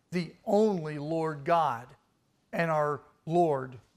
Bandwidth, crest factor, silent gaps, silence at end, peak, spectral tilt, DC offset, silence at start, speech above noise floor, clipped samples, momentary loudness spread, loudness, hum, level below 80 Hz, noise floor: 14.5 kHz; 16 dB; none; 0.2 s; -14 dBFS; -7 dB/octave; under 0.1%; 0.1 s; 43 dB; under 0.1%; 9 LU; -30 LUFS; none; -70 dBFS; -71 dBFS